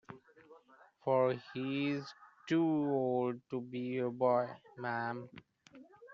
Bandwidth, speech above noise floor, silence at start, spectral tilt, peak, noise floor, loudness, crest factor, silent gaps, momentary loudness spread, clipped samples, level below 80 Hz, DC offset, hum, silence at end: 7.4 kHz; 29 dB; 0.1 s; -5.5 dB/octave; -20 dBFS; -63 dBFS; -35 LUFS; 18 dB; none; 16 LU; under 0.1%; -82 dBFS; under 0.1%; none; 0 s